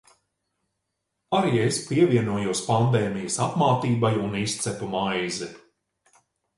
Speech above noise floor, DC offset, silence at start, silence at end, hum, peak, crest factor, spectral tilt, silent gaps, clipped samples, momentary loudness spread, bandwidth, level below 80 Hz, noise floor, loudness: 56 dB; under 0.1%; 1.3 s; 1 s; none; -6 dBFS; 18 dB; -5.5 dB/octave; none; under 0.1%; 7 LU; 11.5 kHz; -58 dBFS; -80 dBFS; -24 LUFS